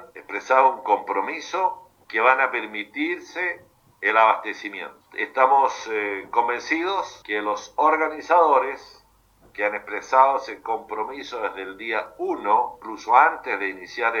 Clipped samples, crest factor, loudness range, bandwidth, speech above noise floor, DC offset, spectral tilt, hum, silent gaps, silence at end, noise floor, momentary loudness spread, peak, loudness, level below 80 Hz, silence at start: under 0.1%; 22 dB; 2 LU; 7.4 kHz; 34 dB; under 0.1%; -2.5 dB/octave; none; none; 0 s; -57 dBFS; 13 LU; -2 dBFS; -22 LUFS; -66 dBFS; 0 s